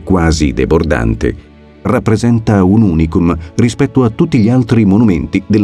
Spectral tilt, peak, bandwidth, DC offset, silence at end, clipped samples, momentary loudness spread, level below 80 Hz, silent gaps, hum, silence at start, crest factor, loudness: -7.5 dB/octave; 0 dBFS; 11 kHz; under 0.1%; 0 s; under 0.1%; 6 LU; -24 dBFS; none; none; 0 s; 10 dB; -11 LUFS